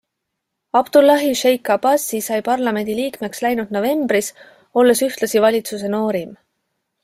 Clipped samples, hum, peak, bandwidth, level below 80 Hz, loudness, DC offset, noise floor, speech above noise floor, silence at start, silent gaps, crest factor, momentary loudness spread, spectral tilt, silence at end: under 0.1%; none; -2 dBFS; 16 kHz; -62 dBFS; -17 LUFS; under 0.1%; -78 dBFS; 61 dB; 0.75 s; none; 16 dB; 9 LU; -3.5 dB/octave; 0.7 s